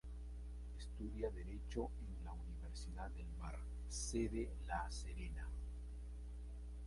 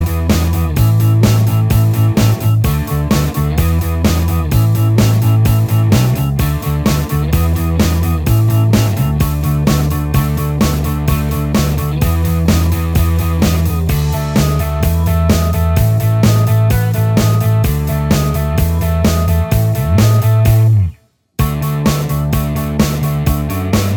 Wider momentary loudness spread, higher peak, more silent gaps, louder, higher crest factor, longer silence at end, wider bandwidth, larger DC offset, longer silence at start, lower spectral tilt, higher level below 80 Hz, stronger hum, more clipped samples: first, 9 LU vs 5 LU; second, -28 dBFS vs 0 dBFS; neither; second, -48 LUFS vs -14 LUFS; first, 18 dB vs 12 dB; about the same, 0 s vs 0 s; second, 11.5 kHz vs over 20 kHz; neither; about the same, 0.05 s vs 0 s; about the same, -5.5 dB/octave vs -6.5 dB/octave; second, -48 dBFS vs -22 dBFS; first, 60 Hz at -50 dBFS vs none; neither